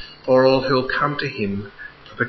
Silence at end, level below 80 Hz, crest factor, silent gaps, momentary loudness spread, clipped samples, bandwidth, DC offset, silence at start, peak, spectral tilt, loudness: 0 s; -48 dBFS; 16 dB; none; 21 LU; under 0.1%; 6 kHz; under 0.1%; 0 s; -4 dBFS; -7 dB/octave; -19 LUFS